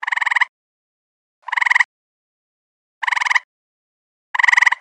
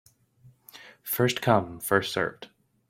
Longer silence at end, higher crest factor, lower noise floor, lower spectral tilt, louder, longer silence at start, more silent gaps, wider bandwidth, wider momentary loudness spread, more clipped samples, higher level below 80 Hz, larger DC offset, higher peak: second, 0.05 s vs 0.45 s; about the same, 18 dB vs 22 dB; first, under -90 dBFS vs -58 dBFS; second, 8.5 dB/octave vs -4.5 dB/octave; first, -16 LUFS vs -26 LUFS; second, 0 s vs 0.45 s; first, 0.49-1.42 s, 1.85-3.01 s, 3.44-4.34 s vs none; second, 11 kHz vs 16.5 kHz; second, 11 LU vs 23 LU; neither; second, under -90 dBFS vs -62 dBFS; neither; first, -2 dBFS vs -6 dBFS